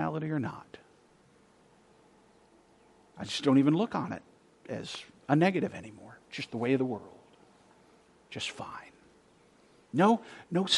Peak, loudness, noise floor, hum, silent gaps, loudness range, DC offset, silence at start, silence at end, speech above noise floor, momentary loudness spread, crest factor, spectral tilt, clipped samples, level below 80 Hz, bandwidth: -10 dBFS; -31 LUFS; -63 dBFS; none; none; 10 LU; under 0.1%; 0 s; 0 s; 33 dB; 20 LU; 24 dB; -5.5 dB/octave; under 0.1%; -74 dBFS; 11.5 kHz